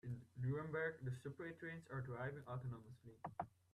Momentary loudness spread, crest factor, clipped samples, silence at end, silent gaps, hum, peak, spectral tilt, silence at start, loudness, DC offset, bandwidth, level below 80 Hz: 9 LU; 16 dB; under 0.1%; 0.25 s; none; none; -32 dBFS; -8 dB/octave; 0.05 s; -49 LUFS; under 0.1%; 11.5 kHz; -74 dBFS